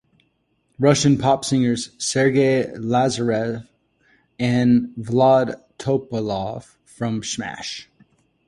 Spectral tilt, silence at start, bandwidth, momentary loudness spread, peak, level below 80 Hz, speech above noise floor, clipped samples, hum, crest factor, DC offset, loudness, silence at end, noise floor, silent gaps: -5.5 dB/octave; 0.8 s; 11.5 kHz; 13 LU; -2 dBFS; -54 dBFS; 48 dB; under 0.1%; none; 18 dB; under 0.1%; -20 LUFS; 0.65 s; -67 dBFS; none